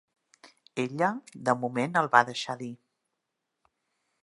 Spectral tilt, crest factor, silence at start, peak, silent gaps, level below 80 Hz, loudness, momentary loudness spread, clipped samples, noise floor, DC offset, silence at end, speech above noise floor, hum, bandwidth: -5 dB/octave; 28 dB; 0.45 s; -4 dBFS; none; -78 dBFS; -28 LUFS; 15 LU; under 0.1%; -83 dBFS; under 0.1%; 1.5 s; 56 dB; none; 11.5 kHz